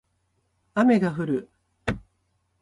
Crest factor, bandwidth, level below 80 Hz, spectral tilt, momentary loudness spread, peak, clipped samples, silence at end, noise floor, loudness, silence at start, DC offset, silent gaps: 18 dB; 11.5 kHz; -50 dBFS; -7.5 dB/octave; 13 LU; -8 dBFS; under 0.1%; 0.6 s; -71 dBFS; -25 LUFS; 0.75 s; under 0.1%; none